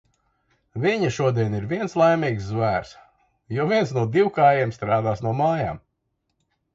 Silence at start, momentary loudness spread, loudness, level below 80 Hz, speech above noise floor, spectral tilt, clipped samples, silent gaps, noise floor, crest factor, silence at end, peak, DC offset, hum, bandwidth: 0.75 s; 8 LU; -22 LUFS; -52 dBFS; 54 dB; -7 dB/octave; under 0.1%; none; -75 dBFS; 18 dB; 0.95 s; -6 dBFS; under 0.1%; none; 7.8 kHz